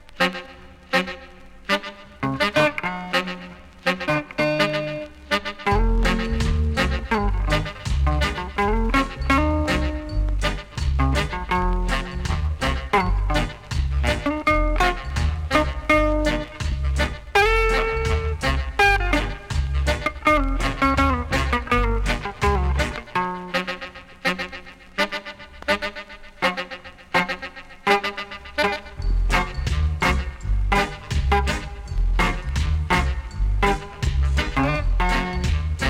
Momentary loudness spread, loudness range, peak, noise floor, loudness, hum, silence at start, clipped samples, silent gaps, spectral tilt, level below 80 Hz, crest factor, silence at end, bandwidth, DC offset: 9 LU; 4 LU; -6 dBFS; -43 dBFS; -23 LUFS; none; 0 s; under 0.1%; none; -5.5 dB/octave; -26 dBFS; 16 dB; 0 s; 15 kHz; under 0.1%